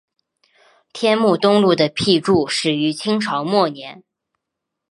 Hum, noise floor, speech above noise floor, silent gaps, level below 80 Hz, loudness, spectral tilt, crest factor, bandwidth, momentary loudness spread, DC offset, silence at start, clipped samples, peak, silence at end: none; -81 dBFS; 64 dB; none; -58 dBFS; -17 LUFS; -5 dB/octave; 18 dB; 11.5 kHz; 8 LU; under 0.1%; 0.95 s; under 0.1%; -2 dBFS; 1 s